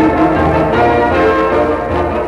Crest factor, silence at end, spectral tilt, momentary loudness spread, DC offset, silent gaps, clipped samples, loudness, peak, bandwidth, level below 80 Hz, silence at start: 10 dB; 0 s; -7.5 dB/octave; 4 LU; under 0.1%; none; under 0.1%; -12 LUFS; -2 dBFS; 11.5 kHz; -28 dBFS; 0 s